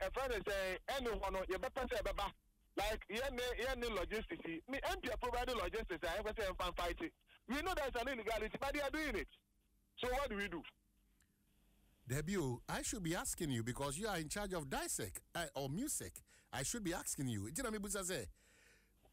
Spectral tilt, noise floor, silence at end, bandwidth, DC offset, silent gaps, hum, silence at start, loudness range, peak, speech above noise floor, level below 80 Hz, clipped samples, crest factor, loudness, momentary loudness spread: -3.5 dB/octave; -78 dBFS; 0.8 s; 16 kHz; under 0.1%; none; none; 0 s; 2 LU; -30 dBFS; 35 dB; -54 dBFS; under 0.1%; 14 dB; -42 LUFS; 5 LU